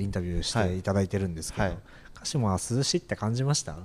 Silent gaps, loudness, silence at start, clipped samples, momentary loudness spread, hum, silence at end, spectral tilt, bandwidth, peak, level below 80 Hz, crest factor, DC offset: none; -29 LUFS; 0 s; under 0.1%; 5 LU; none; 0 s; -5 dB/octave; 15 kHz; -12 dBFS; -44 dBFS; 16 dB; under 0.1%